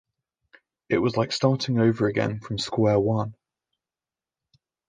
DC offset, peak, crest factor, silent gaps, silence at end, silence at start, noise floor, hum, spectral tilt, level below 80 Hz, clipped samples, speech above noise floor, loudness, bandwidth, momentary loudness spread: under 0.1%; -6 dBFS; 20 dB; none; 1.55 s; 0.9 s; under -90 dBFS; none; -6.5 dB/octave; -56 dBFS; under 0.1%; over 67 dB; -24 LUFS; 9.6 kHz; 7 LU